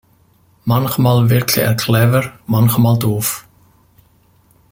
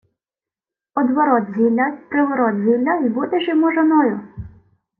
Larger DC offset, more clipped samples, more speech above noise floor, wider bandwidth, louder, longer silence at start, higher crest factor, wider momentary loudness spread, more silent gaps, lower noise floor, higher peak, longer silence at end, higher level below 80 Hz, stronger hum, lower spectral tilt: neither; neither; second, 40 dB vs over 73 dB; first, 17 kHz vs 3.3 kHz; first, -15 LUFS vs -18 LUFS; second, 0.65 s vs 0.95 s; about the same, 16 dB vs 14 dB; about the same, 7 LU vs 8 LU; neither; second, -53 dBFS vs under -90 dBFS; first, 0 dBFS vs -4 dBFS; first, 1.3 s vs 0.5 s; first, -48 dBFS vs -54 dBFS; neither; second, -5.5 dB/octave vs -9.5 dB/octave